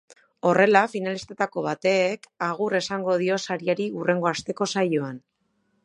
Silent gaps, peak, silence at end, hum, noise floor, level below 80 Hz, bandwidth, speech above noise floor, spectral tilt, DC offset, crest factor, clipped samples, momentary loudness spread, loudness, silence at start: none; -2 dBFS; 0.65 s; none; -71 dBFS; -68 dBFS; 11 kHz; 47 dB; -5 dB/octave; under 0.1%; 22 dB; under 0.1%; 10 LU; -24 LUFS; 0.1 s